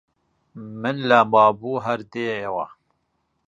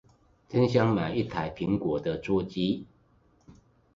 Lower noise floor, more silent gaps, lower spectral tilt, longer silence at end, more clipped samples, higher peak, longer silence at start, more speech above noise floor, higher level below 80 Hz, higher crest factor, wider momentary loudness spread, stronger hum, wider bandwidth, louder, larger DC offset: first, -72 dBFS vs -64 dBFS; neither; second, -6.5 dB/octave vs -8 dB/octave; first, 0.8 s vs 0.45 s; neither; first, -2 dBFS vs -8 dBFS; about the same, 0.55 s vs 0.5 s; first, 51 dB vs 37 dB; second, -66 dBFS vs -54 dBFS; about the same, 22 dB vs 20 dB; first, 18 LU vs 8 LU; neither; first, 9.6 kHz vs 7.6 kHz; first, -20 LUFS vs -28 LUFS; neither